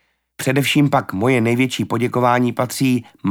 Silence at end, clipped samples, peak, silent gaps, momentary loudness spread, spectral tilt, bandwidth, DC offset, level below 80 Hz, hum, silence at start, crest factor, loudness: 0 s; under 0.1%; -2 dBFS; none; 5 LU; -5.5 dB/octave; 18.5 kHz; under 0.1%; -60 dBFS; none; 0.4 s; 16 dB; -18 LUFS